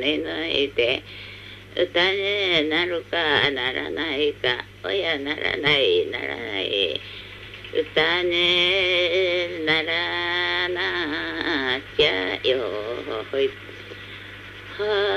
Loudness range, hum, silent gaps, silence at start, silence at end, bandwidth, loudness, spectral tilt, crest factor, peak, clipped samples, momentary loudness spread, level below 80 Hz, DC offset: 4 LU; 50 Hz at -45 dBFS; none; 0 s; 0 s; 13.5 kHz; -22 LUFS; -4.5 dB/octave; 18 dB; -4 dBFS; under 0.1%; 18 LU; -54 dBFS; under 0.1%